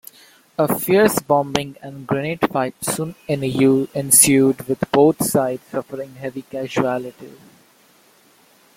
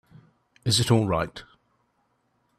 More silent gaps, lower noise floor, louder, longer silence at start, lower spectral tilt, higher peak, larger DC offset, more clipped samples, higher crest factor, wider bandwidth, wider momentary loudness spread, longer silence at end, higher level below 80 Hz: neither; second, -54 dBFS vs -71 dBFS; first, -18 LUFS vs -24 LUFS; about the same, 0.6 s vs 0.65 s; about the same, -4 dB/octave vs -4.5 dB/octave; first, 0 dBFS vs -8 dBFS; neither; neither; about the same, 20 dB vs 20 dB; first, 16.5 kHz vs 14.5 kHz; first, 16 LU vs 13 LU; first, 1.45 s vs 1.15 s; about the same, -56 dBFS vs -54 dBFS